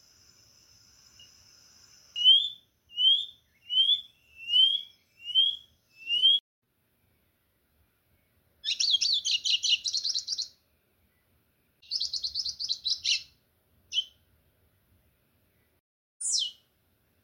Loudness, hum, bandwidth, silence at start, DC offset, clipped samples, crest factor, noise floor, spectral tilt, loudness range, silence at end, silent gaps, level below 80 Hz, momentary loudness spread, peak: -25 LUFS; none; 16.5 kHz; 2.15 s; under 0.1%; under 0.1%; 20 dB; -72 dBFS; 4 dB/octave; 9 LU; 0.7 s; 6.40-6.62 s, 15.80-16.20 s; -74 dBFS; 17 LU; -10 dBFS